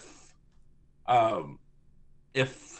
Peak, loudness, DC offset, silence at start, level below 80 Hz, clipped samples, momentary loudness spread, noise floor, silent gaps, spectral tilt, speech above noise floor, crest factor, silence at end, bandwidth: -12 dBFS; -28 LUFS; under 0.1%; 1.05 s; -60 dBFS; under 0.1%; 16 LU; -58 dBFS; none; -5 dB/octave; 30 dB; 20 dB; 0 s; 8.8 kHz